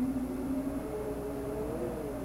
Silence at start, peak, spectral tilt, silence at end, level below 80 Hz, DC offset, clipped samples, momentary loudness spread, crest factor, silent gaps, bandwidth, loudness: 0 s; -24 dBFS; -7.5 dB/octave; 0 s; -48 dBFS; under 0.1%; under 0.1%; 3 LU; 12 dB; none; 16 kHz; -36 LUFS